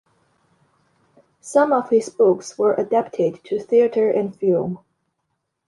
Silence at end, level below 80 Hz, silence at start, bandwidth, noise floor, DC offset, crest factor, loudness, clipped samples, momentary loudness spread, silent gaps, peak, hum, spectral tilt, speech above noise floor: 0.9 s; -68 dBFS; 1.45 s; 11.5 kHz; -75 dBFS; under 0.1%; 18 dB; -19 LUFS; under 0.1%; 6 LU; none; -4 dBFS; none; -6.5 dB/octave; 56 dB